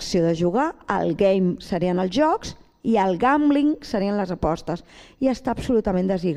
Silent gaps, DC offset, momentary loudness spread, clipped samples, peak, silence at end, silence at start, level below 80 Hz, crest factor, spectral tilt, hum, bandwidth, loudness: none; under 0.1%; 7 LU; under 0.1%; -6 dBFS; 0 s; 0 s; -44 dBFS; 16 dB; -6.5 dB/octave; none; 12 kHz; -22 LUFS